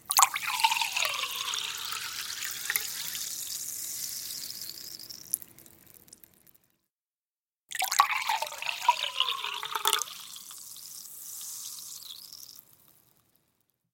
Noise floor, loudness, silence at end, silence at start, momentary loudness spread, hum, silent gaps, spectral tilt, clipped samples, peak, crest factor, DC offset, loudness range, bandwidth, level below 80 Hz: under -90 dBFS; -30 LUFS; 1.3 s; 0.05 s; 16 LU; none; 6.92-7.03 s, 7.14-7.44 s, 7.56-7.67 s; 2.5 dB/octave; under 0.1%; 0 dBFS; 32 dB; under 0.1%; 12 LU; 17 kHz; -76 dBFS